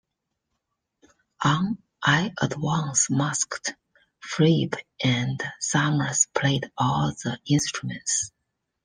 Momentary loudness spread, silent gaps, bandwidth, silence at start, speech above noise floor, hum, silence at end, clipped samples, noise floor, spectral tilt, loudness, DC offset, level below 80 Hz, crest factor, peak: 9 LU; none; 10 kHz; 1.4 s; 57 dB; none; 0.55 s; under 0.1%; -81 dBFS; -4 dB/octave; -24 LUFS; under 0.1%; -58 dBFS; 22 dB; -4 dBFS